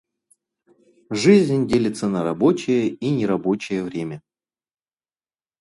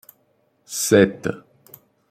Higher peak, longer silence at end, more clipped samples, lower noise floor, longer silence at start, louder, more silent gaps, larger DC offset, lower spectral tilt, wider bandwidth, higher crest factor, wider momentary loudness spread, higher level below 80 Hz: about the same, -2 dBFS vs -2 dBFS; first, 1.4 s vs 0.7 s; neither; first, under -90 dBFS vs -64 dBFS; first, 1.1 s vs 0.7 s; about the same, -20 LUFS vs -19 LUFS; neither; neither; first, -6.5 dB/octave vs -4.5 dB/octave; second, 11.5 kHz vs 16 kHz; about the same, 20 dB vs 20 dB; about the same, 14 LU vs 16 LU; about the same, -58 dBFS vs -60 dBFS